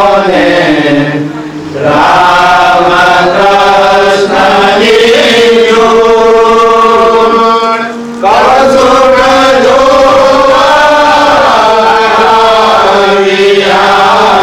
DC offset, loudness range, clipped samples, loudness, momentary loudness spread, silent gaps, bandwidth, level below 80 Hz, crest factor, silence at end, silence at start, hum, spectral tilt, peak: under 0.1%; 1 LU; under 0.1%; -5 LUFS; 4 LU; none; 17 kHz; -34 dBFS; 4 dB; 0 s; 0 s; none; -4 dB/octave; 0 dBFS